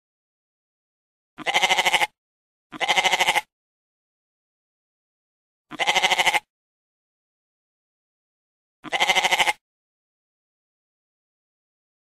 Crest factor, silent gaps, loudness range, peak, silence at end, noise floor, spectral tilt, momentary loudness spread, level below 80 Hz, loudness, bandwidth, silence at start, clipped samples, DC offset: 24 dB; 2.18-2.70 s, 3.52-5.65 s, 6.50-8.83 s; 3 LU; -4 dBFS; 2.5 s; under -90 dBFS; 0 dB/octave; 9 LU; -64 dBFS; -20 LUFS; 16 kHz; 1.4 s; under 0.1%; under 0.1%